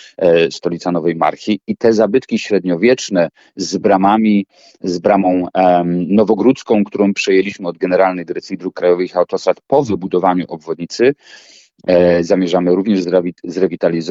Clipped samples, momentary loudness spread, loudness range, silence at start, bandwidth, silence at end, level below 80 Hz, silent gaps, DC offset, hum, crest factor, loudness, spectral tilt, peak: under 0.1%; 10 LU; 2 LU; 0.2 s; 8 kHz; 0 s; -54 dBFS; none; under 0.1%; none; 14 dB; -15 LUFS; -6 dB/octave; 0 dBFS